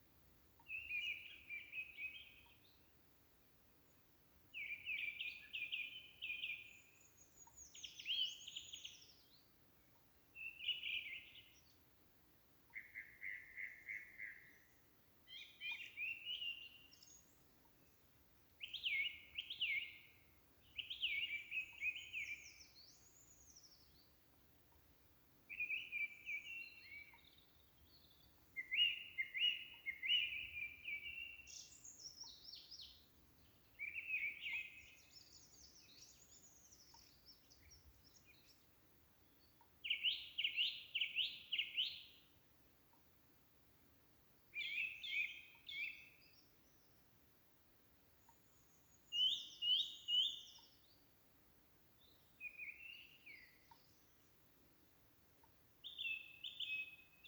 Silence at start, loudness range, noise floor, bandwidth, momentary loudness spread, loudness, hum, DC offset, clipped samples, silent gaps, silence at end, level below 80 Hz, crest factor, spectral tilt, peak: 0 s; 16 LU; -72 dBFS; over 20 kHz; 26 LU; -44 LUFS; none; under 0.1%; under 0.1%; none; 0 s; -80 dBFS; 22 dB; 1 dB/octave; -26 dBFS